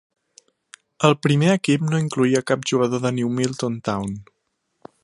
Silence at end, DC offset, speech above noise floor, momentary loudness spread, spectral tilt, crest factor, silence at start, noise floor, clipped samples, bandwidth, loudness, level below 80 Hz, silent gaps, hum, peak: 0.8 s; under 0.1%; 54 dB; 8 LU; -6 dB/octave; 20 dB; 1 s; -74 dBFS; under 0.1%; 11.5 kHz; -21 LUFS; -58 dBFS; none; none; 0 dBFS